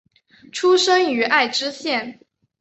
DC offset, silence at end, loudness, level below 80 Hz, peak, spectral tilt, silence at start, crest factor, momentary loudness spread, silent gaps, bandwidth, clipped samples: under 0.1%; 0.5 s; -18 LUFS; -70 dBFS; -2 dBFS; -1.5 dB/octave; 0.55 s; 18 dB; 11 LU; none; 8.2 kHz; under 0.1%